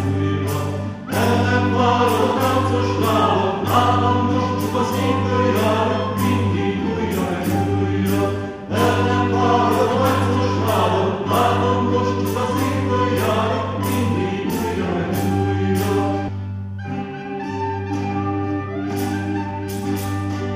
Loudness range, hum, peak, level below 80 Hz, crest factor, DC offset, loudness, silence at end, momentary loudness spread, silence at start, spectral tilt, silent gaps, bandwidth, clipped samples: 6 LU; none; -2 dBFS; -50 dBFS; 16 dB; under 0.1%; -20 LUFS; 0 s; 8 LU; 0 s; -6.5 dB/octave; none; 14 kHz; under 0.1%